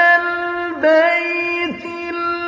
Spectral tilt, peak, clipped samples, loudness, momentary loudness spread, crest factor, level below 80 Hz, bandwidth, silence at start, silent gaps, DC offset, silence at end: -4.5 dB/octave; -4 dBFS; under 0.1%; -17 LUFS; 10 LU; 14 dB; -58 dBFS; 7.6 kHz; 0 s; none; under 0.1%; 0 s